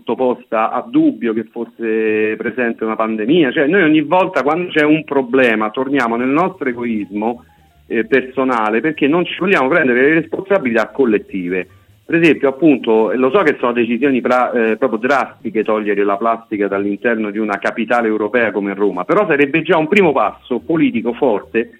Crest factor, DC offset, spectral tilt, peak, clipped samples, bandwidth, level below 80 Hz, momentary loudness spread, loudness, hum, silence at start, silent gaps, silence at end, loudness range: 14 dB; under 0.1%; -7 dB/octave; 0 dBFS; under 0.1%; 9.4 kHz; -58 dBFS; 8 LU; -15 LUFS; none; 0.05 s; none; 0.1 s; 3 LU